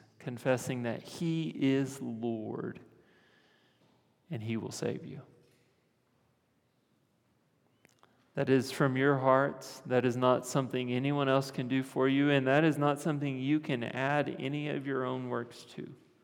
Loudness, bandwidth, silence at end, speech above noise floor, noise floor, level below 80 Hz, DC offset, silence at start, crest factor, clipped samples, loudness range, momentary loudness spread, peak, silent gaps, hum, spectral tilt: -31 LUFS; 17.5 kHz; 0.3 s; 42 dB; -74 dBFS; -82 dBFS; under 0.1%; 0.2 s; 22 dB; under 0.1%; 13 LU; 16 LU; -12 dBFS; none; none; -6 dB/octave